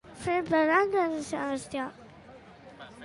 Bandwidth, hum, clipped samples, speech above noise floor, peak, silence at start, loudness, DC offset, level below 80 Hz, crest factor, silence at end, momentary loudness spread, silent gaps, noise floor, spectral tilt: 11.5 kHz; none; under 0.1%; 23 dB; -10 dBFS; 0.05 s; -28 LUFS; under 0.1%; -62 dBFS; 20 dB; 0 s; 15 LU; none; -51 dBFS; -5 dB/octave